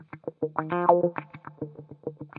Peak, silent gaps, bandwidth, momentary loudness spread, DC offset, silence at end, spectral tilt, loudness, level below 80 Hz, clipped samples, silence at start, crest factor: -6 dBFS; none; 4.2 kHz; 18 LU; under 0.1%; 0.15 s; -11.5 dB/octave; -26 LUFS; -74 dBFS; under 0.1%; 0 s; 24 dB